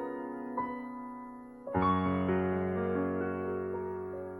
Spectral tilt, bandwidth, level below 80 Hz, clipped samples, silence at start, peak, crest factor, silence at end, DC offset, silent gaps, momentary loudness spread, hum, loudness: -9.5 dB/octave; 11.5 kHz; -60 dBFS; under 0.1%; 0 s; -16 dBFS; 18 dB; 0 s; under 0.1%; none; 14 LU; none; -34 LUFS